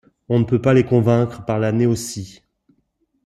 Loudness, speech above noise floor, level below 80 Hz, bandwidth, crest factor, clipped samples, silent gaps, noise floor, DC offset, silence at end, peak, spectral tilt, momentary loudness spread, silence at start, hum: -18 LUFS; 50 dB; -50 dBFS; 13 kHz; 16 dB; under 0.1%; none; -67 dBFS; under 0.1%; 0.95 s; -2 dBFS; -7 dB/octave; 13 LU; 0.3 s; none